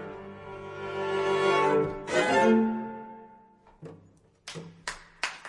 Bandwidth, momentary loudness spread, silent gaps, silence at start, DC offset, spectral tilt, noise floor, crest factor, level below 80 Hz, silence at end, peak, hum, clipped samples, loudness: 11.5 kHz; 22 LU; none; 0 s; under 0.1%; -5 dB/octave; -59 dBFS; 20 dB; -62 dBFS; 0 s; -10 dBFS; none; under 0.1%; -27 LUFS